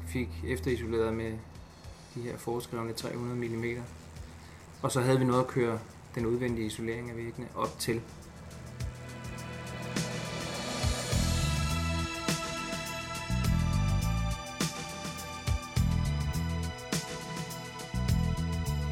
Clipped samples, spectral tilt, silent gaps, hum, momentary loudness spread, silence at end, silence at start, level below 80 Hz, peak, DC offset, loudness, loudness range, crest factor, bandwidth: under 0.1%; -5 dB/octave; none; none; 13 LU; 0 s; 0 s; -40 dBFS; -14 dBFS; under 0.1%; -33 LUFS; 6 LU; 18 dB; 17 kHz